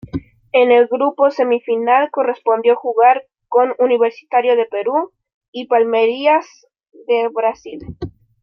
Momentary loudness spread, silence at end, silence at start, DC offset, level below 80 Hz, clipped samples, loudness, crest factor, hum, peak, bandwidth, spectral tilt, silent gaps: 17 LU; 0.3 s; 0.15 s; under 0.1%; -52 dBFS; under 0.1%; -16 LUFS; 14 dB; none; -2 dBFS; 6.2 kHz; -6 dB/octave; 5.34-5.41 s, 5.48-5.53 s